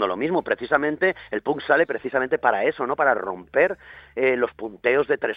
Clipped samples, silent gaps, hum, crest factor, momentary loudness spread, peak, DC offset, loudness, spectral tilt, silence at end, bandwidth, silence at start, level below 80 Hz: under 0.1%; none; none; 20 dB; 6 LU; -2 dBFS; under 0.1%; -22 LUFS; -8 dB/octave; 0 s; 5 kHz; 0 s; -60 dBFS